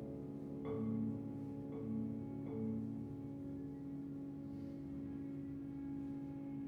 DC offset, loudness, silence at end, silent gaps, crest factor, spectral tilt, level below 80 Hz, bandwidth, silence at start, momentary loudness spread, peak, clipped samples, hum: under 0.1%; -45 LUFS; 0 s; none; 14 dB; -10.5 dB/octave; -66 dBFS; 5 kHz; 0 s; 6 LU; -30 dBFS; under 0.1%; none